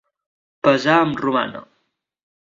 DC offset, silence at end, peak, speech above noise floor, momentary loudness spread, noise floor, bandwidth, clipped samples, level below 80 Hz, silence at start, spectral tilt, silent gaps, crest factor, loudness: under 0.1%; 0.8 s; 0 dBFS; 53 dB; 12 LU; -70 dBFS; 7.6 kHz; under 0.1%; -62 dBFS; 0.65 s; -6 dB/octave; none; 20 dB; -18 LUFS